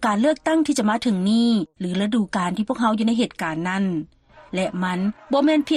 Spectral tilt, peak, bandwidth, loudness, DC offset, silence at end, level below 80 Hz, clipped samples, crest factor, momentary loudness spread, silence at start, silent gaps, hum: -5.5 dB/octave; -10 dBFS; 12.5 kHz; -22 LUFS; under 0.1%; 0 s; -56 dBFS; under 0.1%; 12 dB; 7 LU; 0 s; none; none